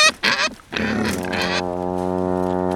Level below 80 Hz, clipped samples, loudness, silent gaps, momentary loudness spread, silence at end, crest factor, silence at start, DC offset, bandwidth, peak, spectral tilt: -46 dBFS; under 0.1%; -21 LUFS; none; 5 LU; 0 s; 20 dB; 0 s; under 0.1%; 17.5 kHz; -2 dBFS; -3.5 dB/octave